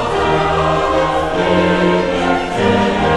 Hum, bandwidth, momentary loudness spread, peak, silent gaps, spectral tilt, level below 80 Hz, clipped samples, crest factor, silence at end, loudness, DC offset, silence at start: none; 11.5 kHz; 3 LU; 0 dBFS; none; -6 dB/octave; -32 dBFS; under 0.1%; 14 dB; 0 s; -15 LUFS; 0.4%; 0 s